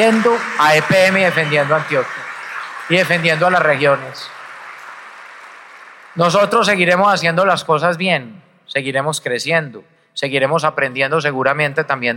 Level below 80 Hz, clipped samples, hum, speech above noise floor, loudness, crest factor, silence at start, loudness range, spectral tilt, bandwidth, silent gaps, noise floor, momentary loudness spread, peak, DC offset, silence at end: -62 dBFS; under 0.1%; none; 24 dB; -15 LUFS; 14 dB; 0 s; 4 LU; -4.5 dB/octave; 17 kHz; none; -39 dBFS; 19 LU; -2 dBFS; under 0.1%; 0 s